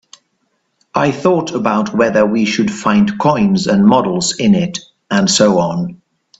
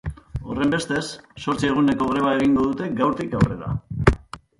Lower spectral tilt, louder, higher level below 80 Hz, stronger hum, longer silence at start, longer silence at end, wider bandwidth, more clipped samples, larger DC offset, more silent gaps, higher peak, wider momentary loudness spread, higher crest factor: second, -5 dB/octave vs -6.5 dB/octave; first, -14 LUFS vs -22 LUFS; second, -50 dBFS vs -36 dBFS; neither; first, 0.95 s vs 0.05 s; first, 0.45 s vs 0.2 s; second, 8 kHz vs 11.5 kHz; neither; neither; neither; about the same, 0 dBFS vs 0 dBFS; second, 8 LU vs 11 LU; second, 14 dB vs 22 dB